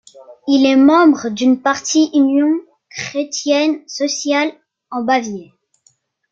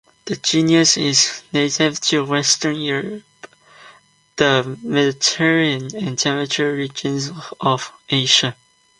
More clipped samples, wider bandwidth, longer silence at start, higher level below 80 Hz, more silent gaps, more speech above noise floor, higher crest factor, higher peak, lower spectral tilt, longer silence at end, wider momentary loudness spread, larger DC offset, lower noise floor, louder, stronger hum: neither; second, 7.8 kHz vs 11 kHz; about the same, 0.2 s vs 0.25 s; about the same, -64 dBFS vs -60 dBFS; neither; first, 44 dB vs 32 dB; second, 14 dB vs 20 dB; about the same, -2 dBFS vs 0 dBFS; about the same, -3 dB/octave vs -3 dB/octave; first, 0.9 s vs 0.45 s; first, 16 LU vs 11 LU; neither; first, -58 dBFS vs -50 dBFS; about the same, -15 LUFS vs -17 LUFS; neither